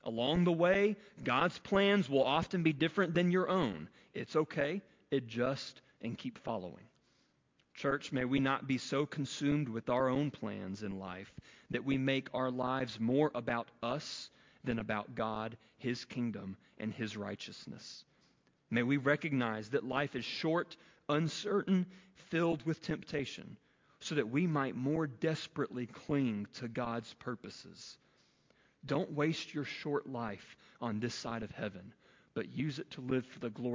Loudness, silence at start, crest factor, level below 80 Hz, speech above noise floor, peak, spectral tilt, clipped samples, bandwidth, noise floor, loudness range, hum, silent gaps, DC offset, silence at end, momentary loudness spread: -36 LUFS; 0.05 s; 20 dB; -66 dBFS; 39 dB; -16 dBFS; -6 dB/octave; under 0.1%; 7.6 kHz; -75 dBFS; 8 LU; none; none; under 0.1%; 0 s; 14 LU